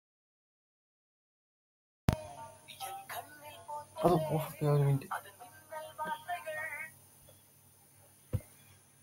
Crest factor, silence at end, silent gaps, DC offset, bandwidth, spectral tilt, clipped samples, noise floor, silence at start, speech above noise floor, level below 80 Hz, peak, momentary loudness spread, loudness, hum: 28 dB; 0.55 s; none; under 0.1%; 16.5 kHz; -6.5 dB/octave; under 0.1%; -63 dBFS; 2.1 s; 32 dB; -56 dBFS; -10 dBFS; 20 LU; -36 LUFS; none